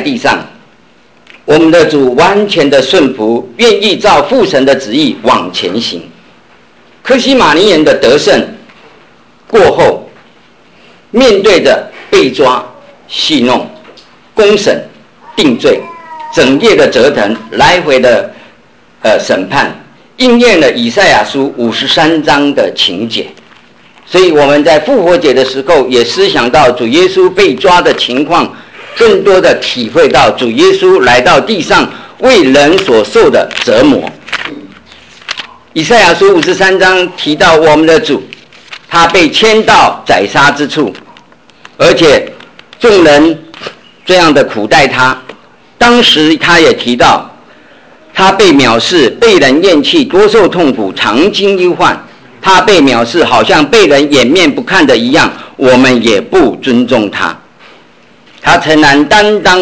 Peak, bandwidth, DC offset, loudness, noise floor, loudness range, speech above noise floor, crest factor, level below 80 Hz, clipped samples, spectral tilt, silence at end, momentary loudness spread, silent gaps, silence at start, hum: 0 dBFS; 8 kHz; under 0.1%; -7 LUFS; -44 dBFS; 4 LU; 37 dB; 8 dB; -40 dBFS; under 0.1%; -4 dB/octave; 0 s; 10 LU; none; 0 s; none